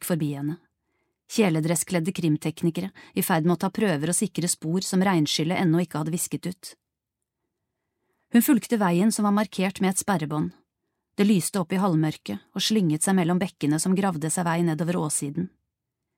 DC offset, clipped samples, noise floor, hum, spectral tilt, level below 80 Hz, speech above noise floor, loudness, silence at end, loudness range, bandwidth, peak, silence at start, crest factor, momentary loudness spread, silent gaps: under 0.1%; under 0.1%; -85 dBFS; none; -5 dB/octave; -68 dBFS; 61 dB; -24 LUFS; 0.7 s; 3 LU; 16.5 kHz; -8 dBFS; 0 s; 16 dB; 10 LU; none